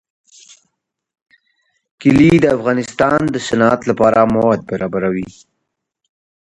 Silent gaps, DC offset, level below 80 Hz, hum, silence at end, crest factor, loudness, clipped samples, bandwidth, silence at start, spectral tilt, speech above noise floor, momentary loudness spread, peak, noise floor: none; under 0.1%; -44 dBFS; none; 1.2 s; 16 dB; -14 LUFS; under 0.1%; 11 kHz; 2 s; -6.5 dB/octave; 61 dB; 9 LU; 0 dBFS; -75 dBFS